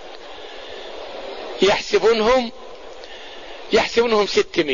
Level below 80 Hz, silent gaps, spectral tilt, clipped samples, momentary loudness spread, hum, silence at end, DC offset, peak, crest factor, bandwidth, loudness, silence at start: -46 dBFS; none; -3.5 dB/octave; under 0.1%; 20 LU; none; 0 s; 1%; -4 dBFS; 18 dB; 7.4 kHz; -18 LUFS; 0 s